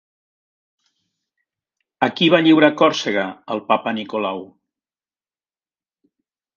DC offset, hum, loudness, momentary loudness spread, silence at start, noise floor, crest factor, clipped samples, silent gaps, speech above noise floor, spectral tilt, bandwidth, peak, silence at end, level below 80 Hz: under 0.1%; none; -17 LUFS; 13 LU; 2 s; under -90 dBFS; 20 dB; under 0.1%; none; over 73 dB; -5 dB/octave; 7.2 kHz; 0 dBFS; 2.1 s; -68 dBFS